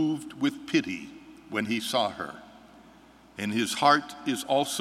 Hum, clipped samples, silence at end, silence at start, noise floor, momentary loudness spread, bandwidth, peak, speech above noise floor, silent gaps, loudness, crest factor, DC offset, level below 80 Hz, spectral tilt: none; under 0.1%; 0 s; 0 s; -54 dBFS; 18 LU; 16 kHz; -6 dBFS; 26 dB; none; -28 LUFS; 22 dB; under 0.1%; -68 dBFS; -3.5 dB/octave